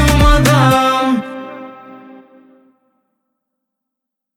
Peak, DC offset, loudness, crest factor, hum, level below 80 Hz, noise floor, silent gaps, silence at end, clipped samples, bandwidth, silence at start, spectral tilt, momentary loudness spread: 0 dBFS; under 0.1%; -12 LUFS; 16 dB; none; -22 dBFS; -80 dBFS; none; 2.4 s; under 0.1%; 17.5 kHz; 0 s; -5.5 dB/octave; 21 LU